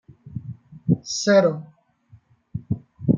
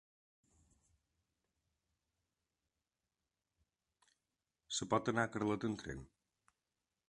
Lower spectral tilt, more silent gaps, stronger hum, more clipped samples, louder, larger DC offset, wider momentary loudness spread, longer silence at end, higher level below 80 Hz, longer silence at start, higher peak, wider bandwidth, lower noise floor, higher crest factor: about the same, -5.5 dB/octave vs -4.5 dB/octave; neither; neither; neither; first, -22 LUFS vs -39 LUFS; neither; first, 20 LU vs 12 LU; second, 0 s vs 1.05 s; first, -54 dBFS vs -70 dBFS; second, 0.25 s vs 4.7 s; first, -4 dBFS vs -18 dBFS; second, 9 kHz vs 11 kHz; second, -54 dBFS vs under -90 dBFS; second, 20 dB vs 26 dB